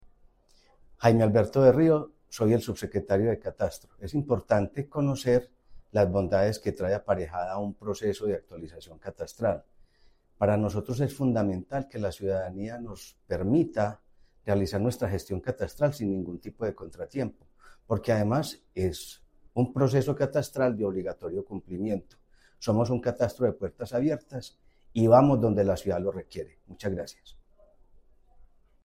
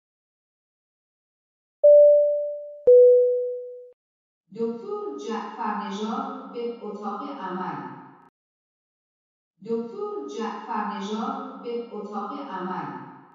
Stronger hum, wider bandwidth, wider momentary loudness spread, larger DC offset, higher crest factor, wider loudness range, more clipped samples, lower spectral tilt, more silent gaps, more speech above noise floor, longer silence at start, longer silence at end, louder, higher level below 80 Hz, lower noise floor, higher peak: neither; first, 16 kHz vs 7.2 kHz; second, 15 LU vs 19 LU; neither; first, 22 dB vs 16 dB; second, 6 LU vs 16 LU; neither; about the same, -7.5 dB/octave vs -6.5 dB/octave; second, none vs 3.93-4.44 s, 8.29-9.54 s; second, 35 dB vs over 59 dB; second, 0.05 s vs 1.85 s; first, 1.5 s vs 0.15 s; second, -28 LUFS vs -23 LUFS; first, -52 dBFS vs -76 dBFS; second, -62 dBFS vs under -90 dBFS; about the same, -6 dBFS vs -8 dBFS